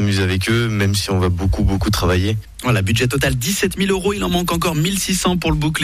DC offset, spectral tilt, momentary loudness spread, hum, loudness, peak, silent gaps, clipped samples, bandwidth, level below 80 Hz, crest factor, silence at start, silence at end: under 0.1%; -5 dB/octave; 2 LU; none; -18 LUFS; -6 dBFS; none; under 0.1%; 15.5 kHz; -30 dBFS; 10 dB; 0 s; 0 s